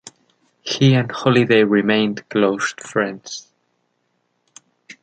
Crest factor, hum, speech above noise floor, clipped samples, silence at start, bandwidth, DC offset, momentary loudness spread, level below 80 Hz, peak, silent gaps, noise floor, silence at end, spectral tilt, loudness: 18 dB; 60 Hz at -50 dBFS; 52 dB; under 0.1%; 0.65 s; 9.2 kHz; under 0.1%; 17 LU; -62 dBFS; -2 dBFS; none; -69 dBFS; 1.6 s; -5.5 dB/octave; -17 LUFS